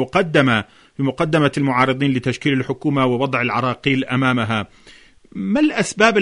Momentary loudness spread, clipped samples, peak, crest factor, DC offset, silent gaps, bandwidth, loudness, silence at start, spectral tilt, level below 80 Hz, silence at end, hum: 8 LU; under 0.1%; -2 dBFS; 18 dB; under 0.1%; none; 11 kHz; -18 LUFS; 0 s; -5.5 dB/octave; -52 dBFS; 0 s; none